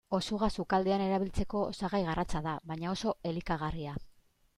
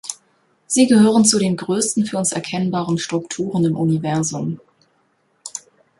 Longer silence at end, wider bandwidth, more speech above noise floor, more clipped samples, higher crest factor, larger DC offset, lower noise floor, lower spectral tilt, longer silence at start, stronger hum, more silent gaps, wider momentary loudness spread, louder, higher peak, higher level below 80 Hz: about the same, 0.45 s vs 0.4 s; about the same, 12 kHz vs 11.5 kHz; second, 31 dB vs 46 dB; neither; about the same, 16 dB vs 18 dB; neither; about the same, -63 dBFS vs -63 dBFS; first, -6 dB/octave vs -4.5 dB/octave; about the same, 0.1 s vs 0.05 s; neither; neither; second, 8 LU vs 19 LU; second, -34 LUFS vs -18 LUFS; second, -16 dBFS vs -2 dBFS; first, -46 dBFS vs -60 dBFS